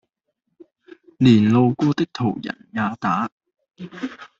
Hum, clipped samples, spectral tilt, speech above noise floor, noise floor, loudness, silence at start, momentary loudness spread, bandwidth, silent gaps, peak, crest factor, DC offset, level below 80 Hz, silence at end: none; under 0.1%; -7.5 dB/octave; 56 dB; -76 dBFS; -20 LUFS; 1.2 s; 17 LU; 7.6 kHz; 3.32-3.38 s; -2 dBFS; 20 dB; under 0.1%; -58 dBFS; 0.15 s